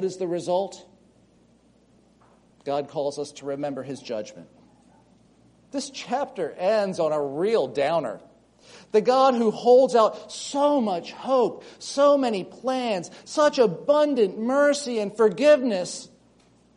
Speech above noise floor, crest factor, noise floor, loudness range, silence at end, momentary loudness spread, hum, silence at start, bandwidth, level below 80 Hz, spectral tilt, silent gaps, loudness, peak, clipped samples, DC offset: 36 dB; 18 dB; -59 dBFS; 11 LU; 0.7 s; 14 LU; none; 0 s; 10.5 kHz; -70 dBFS; -4.5 dB/octave; none; -23 LUFS; -6 dBFS; under 0.1%; under 0.1%